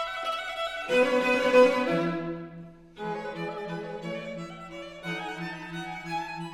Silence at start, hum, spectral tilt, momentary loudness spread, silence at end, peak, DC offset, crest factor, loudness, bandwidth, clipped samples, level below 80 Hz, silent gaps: 0 s; none; -5.5 dB/octave; 18 LU; 0 s; -8 dBFS; under 0.1%; 20 dB; -28 LUFS; 14 kHz; under 0.1%; -62 dBFS; none